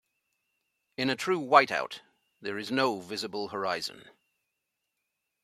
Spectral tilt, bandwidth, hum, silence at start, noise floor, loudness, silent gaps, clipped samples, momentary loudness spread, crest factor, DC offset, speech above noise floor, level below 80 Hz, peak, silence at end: -4 dB/octave; 14.5 kHz; none; 1 s; -83 dBFS; -29 LUFS; none; under 0.1%; 17 LU; 28 dB; under 0.1%; 54 dB; -78 dBFS; -4 dBFS; 1.4 s